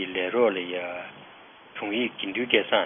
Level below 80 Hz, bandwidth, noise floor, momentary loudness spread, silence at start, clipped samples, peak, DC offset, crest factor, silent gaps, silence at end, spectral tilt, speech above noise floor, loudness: -74 dBFS; 3.7 kHz; -50 dBFS; 18 LU; 0 s; under 0.1%; -4 dBFS; under 0.1%; 24 dB; none; 0 s; -8 dB/octave; 24 dB; -26 LUFS